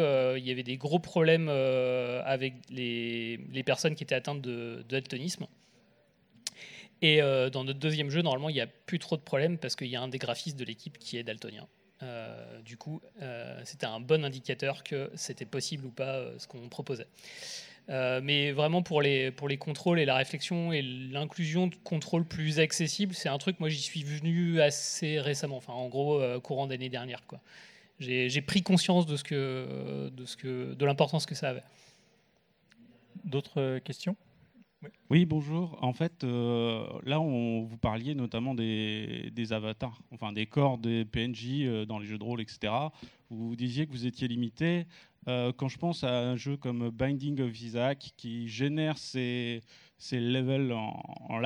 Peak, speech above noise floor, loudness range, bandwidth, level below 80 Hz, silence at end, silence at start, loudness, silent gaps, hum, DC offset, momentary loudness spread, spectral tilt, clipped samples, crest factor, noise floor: -8 dBFS; 38 dB; 6 LU; 14 kHz; -64 dBFS; 0 s; 0 s; -32 LUFS; none; none; under 0.1%; 14 LU; -5.5 dB/octave; under 0.1%; 24 dB; -70 dBFS